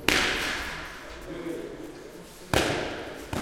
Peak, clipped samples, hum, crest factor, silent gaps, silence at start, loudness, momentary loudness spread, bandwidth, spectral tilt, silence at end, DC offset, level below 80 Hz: -4 dBFS; under 0.1%; none; 26 dB; none; 0 s; -29 LUFS; 18 LU; 17 kHz; -3 dB/octave; 0 s; under 0.1%; -46 dBFS